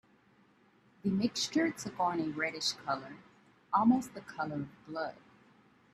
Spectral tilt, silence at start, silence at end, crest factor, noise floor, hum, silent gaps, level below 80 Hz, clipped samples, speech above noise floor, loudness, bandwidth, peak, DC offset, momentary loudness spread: -4 dB/octave; 1.05 s; 0.8 s; 20 dB; -66 dBFS; none; none; -72 dBFS; under 0.1%; 33 dB; -34 LUFS; 13.5 kHz; -16 dBFS; under 0.1%; 13 LU